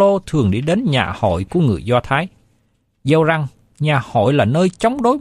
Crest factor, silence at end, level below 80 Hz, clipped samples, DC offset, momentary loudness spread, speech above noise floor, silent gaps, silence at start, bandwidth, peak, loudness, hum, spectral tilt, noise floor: 14 dB; 0 s; -42 dBFS; under 0.1%; under 0.1%; 6 LU; 46 dB; none; 0 s; 11.5 kHz; -2 dBFS; -17 LUFS; none; -7 dB/octave; -62 dBFS